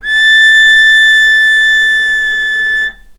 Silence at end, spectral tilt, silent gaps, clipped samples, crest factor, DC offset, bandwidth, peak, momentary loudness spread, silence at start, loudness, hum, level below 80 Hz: 0.25 s; 2.5 dB/octave; none; under 0.1%; 8 dB; under 0.1%; 13 kHz; 0 dBFS; 8 LU; 0.05 s; -6 LUFS; none; -40 dBFS